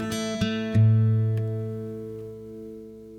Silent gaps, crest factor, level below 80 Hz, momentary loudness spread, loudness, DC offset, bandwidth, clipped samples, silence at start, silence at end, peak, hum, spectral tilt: none; 14 dB; -52 dBFS; 20 LU; -25 LUFS; under 0.1%; 11.5 kHz; under 0.1%; 0 s; 0 s; -12 dBFS; none; -7 dB/octave